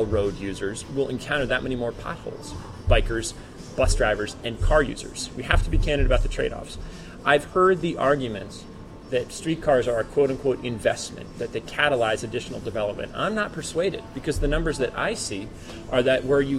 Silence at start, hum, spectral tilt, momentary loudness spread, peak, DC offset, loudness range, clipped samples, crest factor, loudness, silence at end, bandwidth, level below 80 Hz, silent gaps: 0 s; none; -5 dB/octave; 13 LU; -2 dBFS; under 0.1%; 3 LU; under 0.1%; 22 dB; -25 LUFS; 0 s; 12.5 kHz; -32 dBFS; none